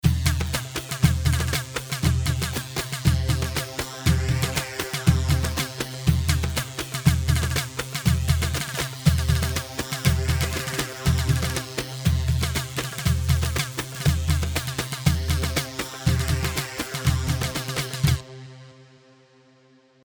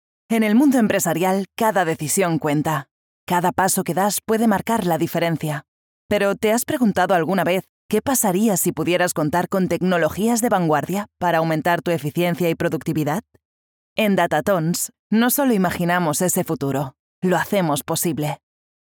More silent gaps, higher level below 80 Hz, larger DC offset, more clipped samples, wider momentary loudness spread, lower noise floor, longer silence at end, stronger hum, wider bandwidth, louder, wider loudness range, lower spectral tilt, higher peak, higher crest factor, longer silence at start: second, none vs 2.91-3.27 s, 5.68-6.09 s, 7.69-7.89 s, 13.45-13.96 s, 14.99-15.10 s, 16.99-17.22 s; first, -30 dBFS vs -60 dBFS; neither; neither; about the same, 6 LU vs 7 LU; second, -57 dBFS vs under -90 dBFS; first, 1.2 s vs 0.5 s; neither; about the same, over 20 kHz vs over 20 kHz; second, -25 LUFS vs -20 LUFS; about the same, 1 LU vs 2 LU; about the same, -4.5 dB/octave vs -5 dB/octave; about the same, -4 dBFS vs -4 dBFS; about the same, 20 dB vs 16 dB; second, 0.05 s vs 0.3 s